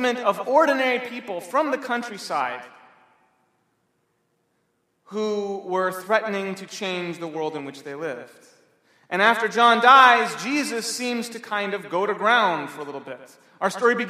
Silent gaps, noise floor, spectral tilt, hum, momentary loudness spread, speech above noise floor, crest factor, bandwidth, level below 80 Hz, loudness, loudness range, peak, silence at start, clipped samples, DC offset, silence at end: none; -71 dBFS; -3 dB/octave; none; 16 LU; 48 dB; 22 dB; 15.5 kHz; -82 dBFS; -22 LUFS; 13 LU; 0 dBFS; 0 s; under 0.1%; under 0.1%; 0 s